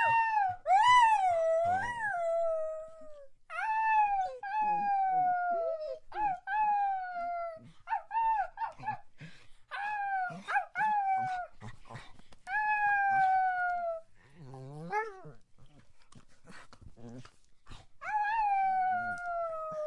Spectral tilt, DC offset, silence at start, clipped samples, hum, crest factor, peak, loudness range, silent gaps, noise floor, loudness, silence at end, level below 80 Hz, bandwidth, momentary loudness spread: -3.5 dB/octave; under 0.1%; 0 s; under 0.1%; none; 18 dB; -14 dBFS; 11 LU; none; -54 dBFS; -31 LUFS; 0 s; -62 dBFS; 11 kHz; 17 LU